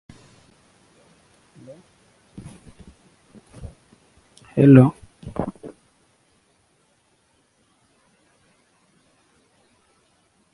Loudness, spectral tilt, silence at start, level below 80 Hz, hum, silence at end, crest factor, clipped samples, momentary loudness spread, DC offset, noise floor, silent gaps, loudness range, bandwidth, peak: -17 LUFS; -9.5 dB/octave; 3.65 s; -54 dBFS; none; 4.85 s; 26 dB; under 0.1%; 32 LU; under 0.1%; -64 dBFS; none; 18 LU; 11.5 kHz; 0 dBFS